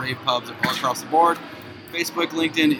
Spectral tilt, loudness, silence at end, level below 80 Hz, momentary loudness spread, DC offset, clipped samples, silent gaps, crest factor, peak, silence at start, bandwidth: -3.5 dB/octave; -22 LUFS; 0 s; -64 dBFS; 12 LU; under 0.1%; under 0.1%; none; 18 dB; -4 dBFS; 0 s; 18.5 kHz